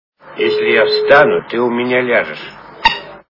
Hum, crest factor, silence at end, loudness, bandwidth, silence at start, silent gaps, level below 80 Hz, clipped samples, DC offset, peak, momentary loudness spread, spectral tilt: none; 14 dB; 0.15 s; -13 LUFS; 6 kHz; 0.25 s; none; -46 dBFS; 0.2%; under 0.1%; 0 dBFS; 15 LU; -5.5 dB/octave